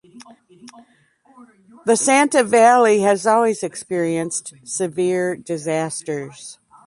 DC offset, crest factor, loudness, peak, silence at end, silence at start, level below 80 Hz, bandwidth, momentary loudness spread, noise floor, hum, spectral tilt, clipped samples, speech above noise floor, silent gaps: under 0.1%; 16 dB; -18 LUFS; -2 dBFS; 0.35 s; 0.15 s; -68 dBFS; 11.5 kHz; 15 LU; -56 dBFS; none; -4 dB/octave; under 0.1%; 38 dB; none